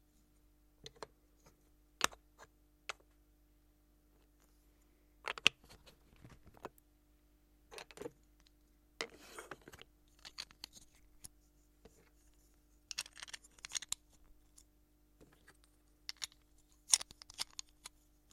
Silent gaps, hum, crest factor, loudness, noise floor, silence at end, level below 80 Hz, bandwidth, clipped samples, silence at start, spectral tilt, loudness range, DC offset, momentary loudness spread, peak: none; 50 Hz at -70 dBFS; 42 dB; -40 LUFS; -71 dBFS; 0.45 s; -70 dBFS; 16.5 kHz; under 0.1%; 0.85 s; 0.5 dB/octave; 14 LU; under 0.1%; 26 LU; -6 dBFS